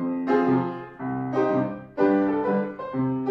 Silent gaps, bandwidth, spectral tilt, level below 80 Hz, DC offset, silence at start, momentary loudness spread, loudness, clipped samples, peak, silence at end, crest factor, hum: none; 6 kHz; -9.5 dB/octave; -62 dBFS; under 0.1%; 0 s; 9 LU; -25 LUFS; under 0.1%; -10 dBFS; 0 s; 14 dB; none